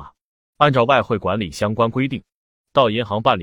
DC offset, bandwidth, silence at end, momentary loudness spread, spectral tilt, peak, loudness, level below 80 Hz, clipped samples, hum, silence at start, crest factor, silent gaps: under 0.1%; 17 kHz; 0 s; 7 LU; -6.5 dB/octave; 0 dBFS; -19 LUFS; -52 dBFS; under 0.1%; none; 0 s; 18 dB; 0.21-0.53 s, 2.34-2.65 s